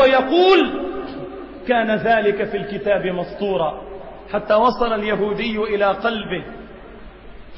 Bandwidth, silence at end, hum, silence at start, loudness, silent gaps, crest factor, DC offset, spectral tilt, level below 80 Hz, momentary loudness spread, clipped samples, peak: 7 kHz; 0 s; none; 0 s; -19 LUFS; none; 16 dB; under 0.1%; -7 dB/octave; -44 dBFS; 19 LU; under 0.1%; -4 dBFS